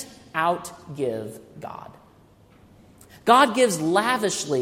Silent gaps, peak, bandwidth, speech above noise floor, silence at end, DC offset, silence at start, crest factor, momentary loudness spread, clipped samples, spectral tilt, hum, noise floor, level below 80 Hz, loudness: none; -2 dBFS; 16 kHz; 31 dB; 0 s; under 0.1%; 0 s; 24 dB; 21 LU; under 0.1%; -3.5 dB/octave; none; -54 dBFS; -64 dBFS; -22 LUFS